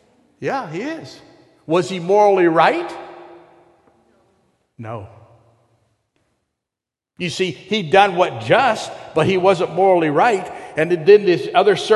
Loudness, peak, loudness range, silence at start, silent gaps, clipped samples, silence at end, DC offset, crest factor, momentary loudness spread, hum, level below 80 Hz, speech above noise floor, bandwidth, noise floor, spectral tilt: -17 LUFS; 0 dBFS; 13 LU; 0.4 s; none; under 0.1%; 0 s; under 0.1%; 18 dB; 18 LU; none; -58 dBFS; 70 dB; 11.5 kHz; -87 dBFS; -5.5 dB/octave